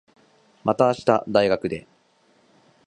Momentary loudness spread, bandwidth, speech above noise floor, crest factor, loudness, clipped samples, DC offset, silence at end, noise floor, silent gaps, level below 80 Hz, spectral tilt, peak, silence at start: 10 LU; 10.5 kHz; 40 dB; 22 dB; -22 LUFS; under 0.1%; under 0.1%; 1.05 s; -61 dBFS; none; -60 dBFS; -6.5 dB/octave; -2 dBFS; 0.65 s